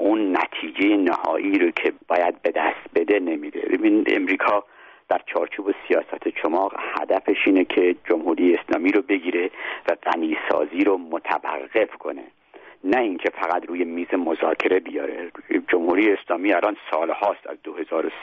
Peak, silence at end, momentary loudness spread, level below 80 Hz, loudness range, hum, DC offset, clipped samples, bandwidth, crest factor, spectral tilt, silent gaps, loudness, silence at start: -6 dBFS; 0 s; 8 LU; -68 dBFS; 3 LU; none; under 0.1%; under 0.1%; 6.2 kHz; 16 dB; -1.5 dB/octave; none; -22 LUFS; 0 s